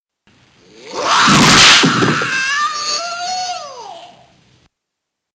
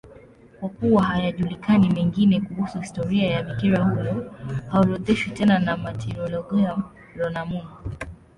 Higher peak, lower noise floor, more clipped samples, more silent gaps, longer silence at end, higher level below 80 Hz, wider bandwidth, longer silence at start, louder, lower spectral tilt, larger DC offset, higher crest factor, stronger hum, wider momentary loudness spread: first, 0 dBFS vs -6 dBFS; first, -78 dBFS vs -48 dBFS; neither; neither; first, 1.3 s vs 0.25 s; about the same, -44 dBFS vs -46 dBFS; first, 16.5 kHz vs 10.5 kHz; first, 0.85 s vs 0.05 s; first, -11 LUFS vs -23 LUFS; second, -2 dB/octave vs -7.5 dB/octave; neither; about the same, 16 dB vs 16 dB; neither; first, 21 LU vs 13 LU